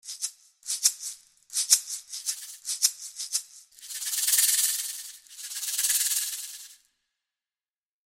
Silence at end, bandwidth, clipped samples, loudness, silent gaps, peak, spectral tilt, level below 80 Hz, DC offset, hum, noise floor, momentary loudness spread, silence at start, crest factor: 1.3 s; 17 kHz; under 0.1%; -26 LUFS; none; -2 dBFS; 7.5 dB/octave; -74 dBFS; under 0.1%; none; under -90 dBFS; 17 LU; 0.05 s; 28 dB